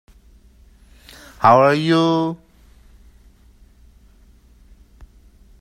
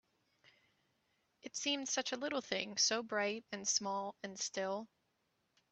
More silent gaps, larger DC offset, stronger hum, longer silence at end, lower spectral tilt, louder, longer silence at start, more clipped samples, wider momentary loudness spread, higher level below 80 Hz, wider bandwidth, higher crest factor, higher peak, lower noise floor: neither; neither; neither; first, 3.25 s vs 0.85 s; first, -6.5 dB/octave vs -1 dB/octave; first, -16 LUFS vs -38 LUFS; about the same, 1.4 s vs 1.45 s; neither; about the same, 13 LU vs 12 LU; first, -50 dBFS vs -86 dBFS; first, 14 kHz vs 8.4 kHz; about the same, 22 dB vs 24 dB; first, 0 dBFS vs -18 dBFS; second, -50 dBFS vs -82 dBFS